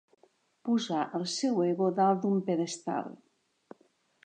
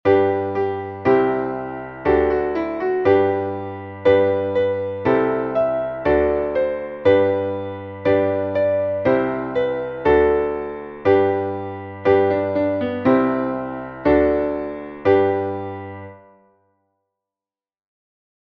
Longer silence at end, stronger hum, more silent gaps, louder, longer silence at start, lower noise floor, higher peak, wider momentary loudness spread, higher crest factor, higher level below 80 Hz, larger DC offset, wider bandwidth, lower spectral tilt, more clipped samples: second, 1.1 s vs 2.4 s; neither; neither; second, -30 LUFS vs -20 LUFS; first, 0.65 s vs 0.05 s; second, -69 dBFS vs under -90 dBFS; second, -14 dBFS vs -4 dBFS; about the same, 9 LU vs 11 LU; about the same, 18 dB vs 16 dB; second, -84 dBFS vs -44 dBFS; neither; first, 9.4 kHz vs 5.8 kHz; second, -5.5 dB/octave vs -9 dB/octave; neither